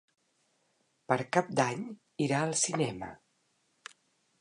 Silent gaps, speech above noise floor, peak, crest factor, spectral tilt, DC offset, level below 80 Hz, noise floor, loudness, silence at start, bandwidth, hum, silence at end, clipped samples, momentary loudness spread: none; 43 dB; -10 dBFS; 24 dB; -4 dB/octave; under 0.1%; -72 dBFS; -74 dBFS; -31 LUFS; 1.1 s; 11 kHz; none; 1.25 s; under 0.1%; 23 LU